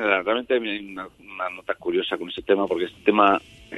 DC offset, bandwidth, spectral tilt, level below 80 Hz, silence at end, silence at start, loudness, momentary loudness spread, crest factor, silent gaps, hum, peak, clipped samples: under 0.1%; 12 kHz; -6 dB/octave; -58 dBFS; 0 s; 0 s; -23 LUFS; 13 LU; 20 dB; none; none; -2 dBFS; under 0.1%